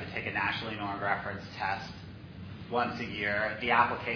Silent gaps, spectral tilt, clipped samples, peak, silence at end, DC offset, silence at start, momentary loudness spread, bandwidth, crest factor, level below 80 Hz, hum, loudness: none; -6 dB/octave; under 0.1%; -12 dBFS; 0 s; under 0.1%; 0 s; 19 LU; 5.4 kHz; 22 dB; -58 dBFS; none; -31 LUFS